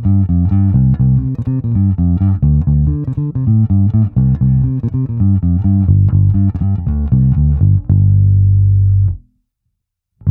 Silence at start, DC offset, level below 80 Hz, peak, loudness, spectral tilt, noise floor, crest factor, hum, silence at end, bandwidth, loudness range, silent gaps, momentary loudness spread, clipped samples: 0 s; under 0.1%; -22 dBFS; 0 dBFS; -13 LUFS; -14 dB/octave; -72 dBFS; 12 dB; none; 0 s; 1.5 kHz; 2 LU; none; 6 LU; under 0.1%